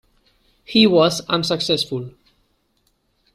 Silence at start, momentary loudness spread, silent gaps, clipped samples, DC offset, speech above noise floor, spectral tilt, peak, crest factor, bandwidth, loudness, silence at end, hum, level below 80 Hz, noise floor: 0.7 s; 13 LU; none; under 0.1%; under 0.1%; 48 dB; -4.5 dB/octave; -2 dBFS; 20 dB; 15 kHz; -18 LUFS; 1.25 s; none; -56 dBFS; -66 dBFS